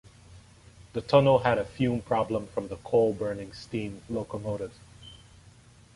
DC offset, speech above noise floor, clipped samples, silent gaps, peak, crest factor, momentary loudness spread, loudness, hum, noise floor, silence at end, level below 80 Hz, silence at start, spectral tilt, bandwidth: under 0.1%; 28 dB; under 0.1%; none; -6 dBFS; 22 dB; 17 LU; -28 LUFS; none; -55 dBFS; 0.8 s; -54 dBFS; 0.3 s; -7 dB/octave; 11.5 kHz